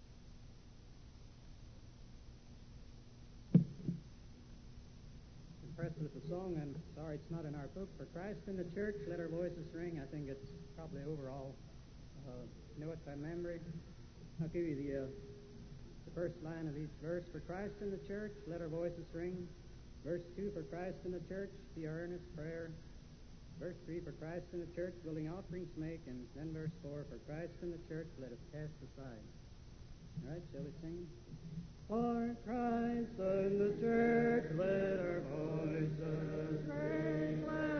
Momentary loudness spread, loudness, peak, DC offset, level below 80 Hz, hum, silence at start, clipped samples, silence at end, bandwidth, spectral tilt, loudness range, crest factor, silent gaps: 21 LU; -43 LUFS; -16 dBFS; under 0.1%; -58 dBFS; none; 0 s; under 0.1%; 0 s; 6.4 kHz; -7.5 dB/octave; 13 LU; 26 dB; none